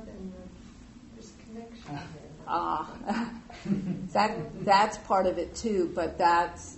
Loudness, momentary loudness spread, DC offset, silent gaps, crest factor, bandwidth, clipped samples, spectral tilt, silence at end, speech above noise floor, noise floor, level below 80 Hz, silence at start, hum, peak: -28 LUFS; 22 LU; under 0.1%; none; 20 dB; 8.2 kHz; under 0.1%; -5 dB/octave; 0 s; 22 dB; -49 dBFS; -54 dBFS; 0 s; none; -10 dBFS